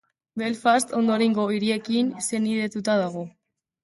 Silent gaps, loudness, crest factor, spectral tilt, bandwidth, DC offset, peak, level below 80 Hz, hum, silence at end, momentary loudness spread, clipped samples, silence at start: none; -24 LUFS; 16 dB; -4.5 dB/octave; 12 kHz; under 0.1%; -8 dBFS; -70 dBFS; none; 0.55 s; 9 LU; under 0.1%; 0.35 s